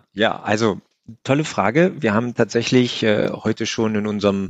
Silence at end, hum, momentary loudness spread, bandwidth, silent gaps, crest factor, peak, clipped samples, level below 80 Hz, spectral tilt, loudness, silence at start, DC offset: 0 s; none; 5 LU; 9 kHz; none; 18 dB; -2 dBFS; under 0.1%; -60 dBFS; -5.5 dB/octave; -19 LUFS; 0.15 s; under 0.1%